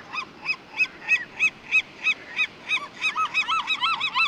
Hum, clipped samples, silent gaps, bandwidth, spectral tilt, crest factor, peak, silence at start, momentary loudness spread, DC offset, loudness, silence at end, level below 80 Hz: none; under 0.1%; none; 12 kHz; 0 dB/octave; 14 dB; -12 dBFS; 0 s; 7 LU; under 0.1%; -24 LUFS; 0 s; -68 dBFS